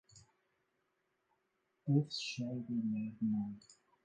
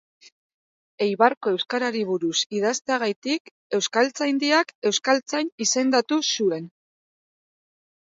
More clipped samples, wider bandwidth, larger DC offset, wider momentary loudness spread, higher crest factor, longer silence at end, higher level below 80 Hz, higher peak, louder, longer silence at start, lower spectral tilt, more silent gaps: neither; first, 9.4 kHz vs 8 kHz; neither; first, 11 LU vs 7 LU; about the same, 20 dB vs 22 dB; second, 0.3 s vs 1.35 s; about the same, -80 dBFS vs -78 dBFS; second, -22 dBFS vs -4 dBFS; second, -38 LUFS vs -23 LUFS; second, 0.15 s vs 1 s; first, -6.5 dB/octave vs -2.5 dB/octave; second, none vs 1.37-1.41 s, 2.46-2.50 s, 3.16-3.22 s, 3.40-3.45 s, 3.51-3.70 s, 4.75-4.82 s, 5.52-5.58 s